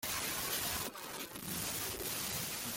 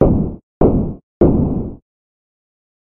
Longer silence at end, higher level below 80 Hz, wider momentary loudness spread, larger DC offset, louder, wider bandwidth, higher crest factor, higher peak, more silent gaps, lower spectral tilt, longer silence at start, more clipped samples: second, 0 s vs 1.15 s; second, -62 dBFS vs -26 dBFS; second, 7 LU vs 11 LU; neither; second, -37 LUFS vs -17 LUFS; first, 17 kHz vs 3.2 kHz; about the same, 16 dB vs 18 dB; second, -24 dBFS vs 0 dBFS; second, none vs 0.43-0.61 s, 1.03-1.20 s; second, -1.5 dB/octave vs -14 dB/octave; about the same, 0 s vs 0 s; neither